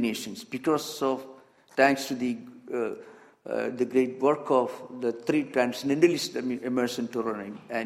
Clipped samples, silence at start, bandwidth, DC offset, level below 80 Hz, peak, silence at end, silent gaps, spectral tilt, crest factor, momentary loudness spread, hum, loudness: under 0.1%; 0 s; 15.5 kHz; under 0.1%; -72 dBFS; -6 dBFS; 0 s; none; -4.5 dB/octave; 22 dB; 12 LU; none; -28 LUFS